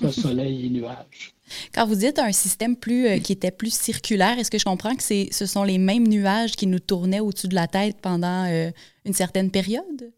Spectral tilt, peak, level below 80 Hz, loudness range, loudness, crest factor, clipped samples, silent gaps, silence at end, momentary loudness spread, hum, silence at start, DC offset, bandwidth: -4.5 dB/octave; -6 dBFS; -56 dBFS; 2 LU; -22 LUFS; 16 dB; under 0.1%; none; 0.05 s; 10 LU; none; 0 s; under 0.1%; 17.5 kHz